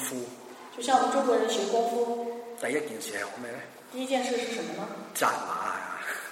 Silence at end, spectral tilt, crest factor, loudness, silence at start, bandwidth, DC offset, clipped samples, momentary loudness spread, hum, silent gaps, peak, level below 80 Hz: 0 s; -2.5 dB/octave; 20 dB; -30 LUFS; 0 s; 16 kHz; under 0.1%; under 0.1%; 14 LU; none; none; -10 dBFS; -82 dBFS